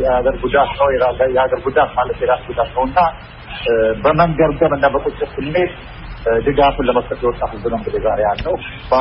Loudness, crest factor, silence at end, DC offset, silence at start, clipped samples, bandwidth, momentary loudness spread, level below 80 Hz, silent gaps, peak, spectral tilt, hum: -16 LUFS; 16 dB; 0 s; under 0.1%; 0 s; under 0.1%; 5.6 kHz; 8 LU; -32 dBFS; none; 0 dBFS; -4 dB/octave; none